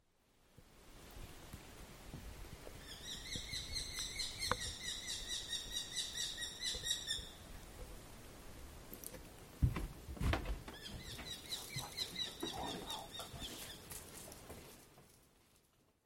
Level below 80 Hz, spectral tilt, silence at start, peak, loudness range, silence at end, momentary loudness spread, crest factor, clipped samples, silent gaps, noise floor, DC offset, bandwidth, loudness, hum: -54 dBFS; -2.5 dB/octave; 0.4 s; -18 dBFS; 8 LU; 0.45 s; 16 LU; 28 dB; under 0.1%; none; -73 dBFS; under 0.1%; 17 kHz; -43 LUFS; none